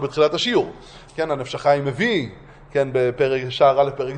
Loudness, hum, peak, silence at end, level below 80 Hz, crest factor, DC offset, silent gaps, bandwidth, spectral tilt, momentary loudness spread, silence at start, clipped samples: -20 LUFS; none; -4 dBFS; 0 s; -52 dBFS; 18 dB; under 0.1%; none; 9.6 kHz; -5.5 dB/octave; 10 LU; 0 s; under 0.1%